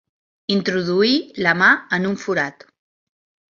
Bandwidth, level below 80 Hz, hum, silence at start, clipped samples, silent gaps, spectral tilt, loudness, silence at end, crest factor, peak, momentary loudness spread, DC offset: 7.4 kHz; -62 dBFS; none; 0.5 s; under 0.1%; none; -5 dB/octave; -18 LUFS; 1 s; 18 dB; -2 dBFS; 8 LU; under 0.1%